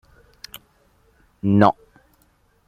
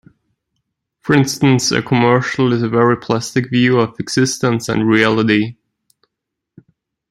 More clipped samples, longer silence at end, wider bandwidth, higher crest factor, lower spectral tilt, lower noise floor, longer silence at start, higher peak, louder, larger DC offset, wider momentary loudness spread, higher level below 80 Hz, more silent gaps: neither; second, 0.95 s vs 1.6 s; first, 15.5 kHz vs 13.5 kHz; first, 22 dB vs 14 dB; first, -8 dB/octave vs -5 dB/octave; second, -61 dBFS vs -79 dBFS; first, 1.45 s vs 1.05 s; about the same, -2 dBFS vs -2 dBFS; second, -18 LUFS vs -15 LUFS; neither; first, 26 LU vs 5 LU; about the same, -56 dBFS vs -52 dBFS; neither